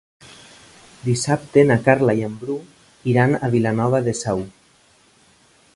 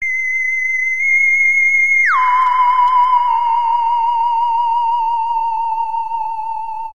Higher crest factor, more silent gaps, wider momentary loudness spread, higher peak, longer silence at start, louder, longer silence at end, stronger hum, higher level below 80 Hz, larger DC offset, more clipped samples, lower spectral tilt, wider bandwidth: first, 20 dB vs 10 dB; neither; first, 13 LU vs 10 LU; first, 0 dBFS vs -4 dBFS; first, 1.05 s vs 0 s; second, -19 LUFS vs -14 LUFS; first, 1.25 s vs 0 s; neither; about the same, -54 dBFS vs -58 dBFS; second, under 0.1% vs 3%; neither; first, -6.5 dB/octave vs 2 dB/octave; about the same, 11.5 kHz vs 11.5 kHz